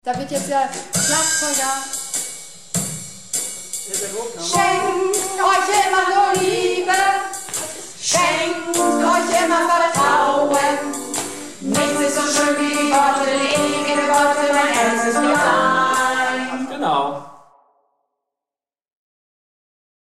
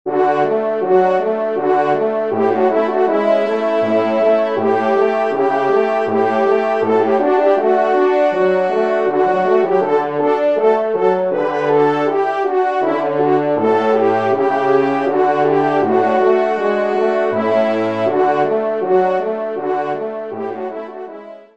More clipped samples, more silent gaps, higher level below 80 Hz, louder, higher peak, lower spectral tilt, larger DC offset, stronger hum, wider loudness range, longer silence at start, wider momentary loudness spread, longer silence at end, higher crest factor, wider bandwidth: neither; neither; first, -60 dBFS vs -66 dBFS; about the same, -18 LUFS vs -16 LUFS; about the same, -4 dBFS vs -2 dBFS; second, -2 dB/octave vs -7 dB/octave; about the same, 0.6% vs 0.4%; neither; first, 6 LU vs 2 LU; about the same, 0.05 s vs 0.05 s; first, 9 LU vs 4 LU; first, 2.65 s vs 0.2 s; about the same, 14 dB vs 14 dB; first, 16 kHz vs 7.4 kHz